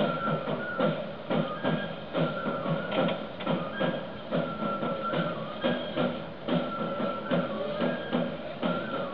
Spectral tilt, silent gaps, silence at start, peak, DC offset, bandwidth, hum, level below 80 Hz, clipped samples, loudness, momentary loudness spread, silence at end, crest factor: -9 dB/octave; none; 0 s; -12 dBFS; 0.4%; 5.4 kHz; none; -62 dBFS; under 0.1%; -31 LUFS; 4 LU; 0 s; 18 dB